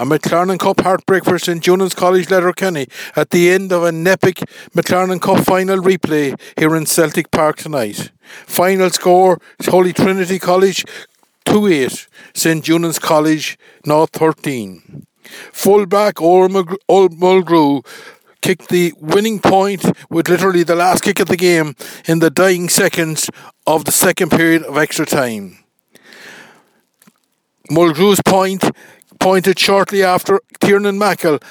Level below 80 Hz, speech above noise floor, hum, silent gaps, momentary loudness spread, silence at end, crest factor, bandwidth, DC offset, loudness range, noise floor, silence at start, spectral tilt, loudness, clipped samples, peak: -54 dBFS; 51 dB; none; none; 9 LU; 0.15 s; 14 dB; over 20 kHz; under 0.1%; 3 LU; -64 dBFS; 0 s; -4.5 dB/octave; -14 LUFS; under 0.1%; 0 dBFS